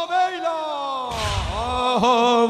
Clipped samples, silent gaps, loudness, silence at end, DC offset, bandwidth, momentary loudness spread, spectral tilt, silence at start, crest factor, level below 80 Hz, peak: under 0.1%; none; -22 LUFS; 0 s; under 0.1%; 14 kHz; 9 LU; -4.5 dB/octave; 0 s; 16 dB; -38 dBFS; -4 dBFS